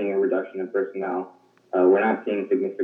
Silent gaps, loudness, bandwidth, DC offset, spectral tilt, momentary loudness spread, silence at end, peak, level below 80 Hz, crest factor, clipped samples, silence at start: none; -24 LUFS; 3.7 kHz; under 0.1%; -9 dB/octave; 10 LU; 0 s; -8 dBFS; under -90 dBFS; 16 dB; under 0.1%; 0 s